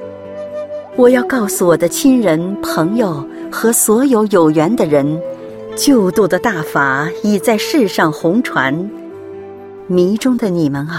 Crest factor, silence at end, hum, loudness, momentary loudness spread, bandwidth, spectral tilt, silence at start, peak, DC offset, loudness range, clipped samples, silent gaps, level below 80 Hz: 14 dB; 0 s; none; -13 LUFS; 15 LU; 16.5 kHz; -5 dB/octave; 0 s; 0 dBFS; under 0.1%; 3 LU; under 0.1%; none; -50 dBFS